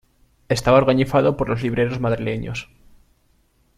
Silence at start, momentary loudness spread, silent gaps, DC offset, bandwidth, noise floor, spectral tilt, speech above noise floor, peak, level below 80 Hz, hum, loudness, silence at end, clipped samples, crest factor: 0.5 s; 11 LU; none; under 0.1%; 14.5 kHz; -61 dBFS; -6.5 dB/octave; 42 dB; -2 dBFS; -44 dBFS; none; -20 LUFS; 1.15 s; under 0.1%; 18 dB